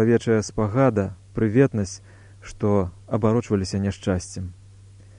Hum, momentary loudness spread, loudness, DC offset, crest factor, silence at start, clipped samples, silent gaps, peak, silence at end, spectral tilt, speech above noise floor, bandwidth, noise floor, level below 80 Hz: none; 14 LU; -23 LUFS; under 0.1%; 18 dB; 0 s; under 0.1%; none; -6 dBFS; 0.65 s; -7 dB/octave; 25 dB; 10.5 kHz; -47 dBFS; -48 dBFS